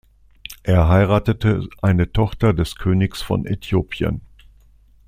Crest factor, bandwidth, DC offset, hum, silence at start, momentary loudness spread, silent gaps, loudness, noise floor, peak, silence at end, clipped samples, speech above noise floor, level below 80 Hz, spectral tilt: 18 dB; 15 kHz; under 0.1%; none; 0.5 s; 10 LU; none; -19 LUFS; -51 dBFS; -2 dBFS; 0.85 s; under 0.1%; 33 dB; -34 dBFS; -7.5 dB/octave